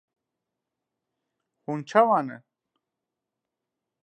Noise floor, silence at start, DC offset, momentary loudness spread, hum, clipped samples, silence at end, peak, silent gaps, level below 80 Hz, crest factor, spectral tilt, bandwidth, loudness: -86 dBFS; 1.7 s; under 0.1%; 17 LU; none; under 0.1%; 1.65 s; -4 dBFS; none; -86 dBFS; 26 dB; -6.5 dB/octave; 9.4 kHz; -24 LUFS